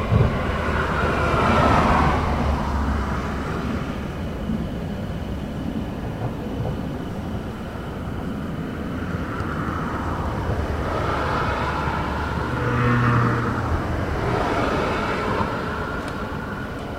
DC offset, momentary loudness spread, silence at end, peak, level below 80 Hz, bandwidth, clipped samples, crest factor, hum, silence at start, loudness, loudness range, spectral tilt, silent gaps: under 0.1%; 10 LU; 0 s; -4 dBFS; -32 dBFS; 15.5 kHz; under 0.1%; 18 dB; none; 0 s; -24 LUFS; 8 LU; -7 dB/octave; none